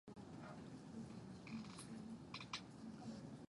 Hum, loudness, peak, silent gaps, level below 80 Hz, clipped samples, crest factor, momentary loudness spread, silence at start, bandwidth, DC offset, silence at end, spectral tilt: none; -54 LUFS; -32 dBFS; none; -74 dBFS; under 0.1%; 22 dB; 5 LU; 0.05 s; 11 kHz; under 0.1%; 0.05 s; -5 dB/octave